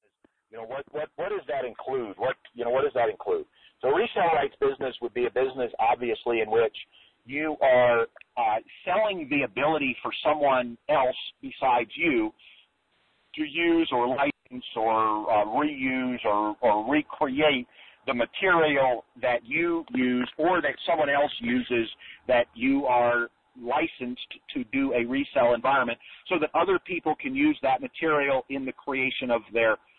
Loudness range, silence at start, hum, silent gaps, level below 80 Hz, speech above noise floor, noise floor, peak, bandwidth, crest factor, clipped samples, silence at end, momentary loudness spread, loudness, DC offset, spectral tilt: 2 LU; 0.55 s; none; none; -60 dBFS; 43 dB; -69 dBFS; -12 dBFS; 4.4 kHz; 16 dB; under 0.1%; 0.2 s; 10 LU; -26 LUFS; under 0.1%; -8.5 dB/octave